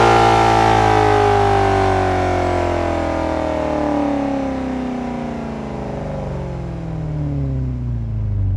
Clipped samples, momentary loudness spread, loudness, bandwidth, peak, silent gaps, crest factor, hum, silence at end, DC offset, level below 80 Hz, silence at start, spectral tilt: under 0.1%; 13 LU; -18 LUFS; 12 kHz; -2 dBFS; none; 16 dB; none; 0 s; under 0.1%; -30 dBFS; 0 s; -6.5 dB/octave